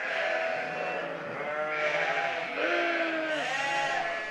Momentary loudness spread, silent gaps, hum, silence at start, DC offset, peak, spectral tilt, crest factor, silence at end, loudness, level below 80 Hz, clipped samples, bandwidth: 6 LU; none; none; 0 s; under 0.1%; -14 dBFS; -3 dB/octave; 16 dB; 0 s; -29 LUFS; -72 dBFS; under 0.1%; 12 kHz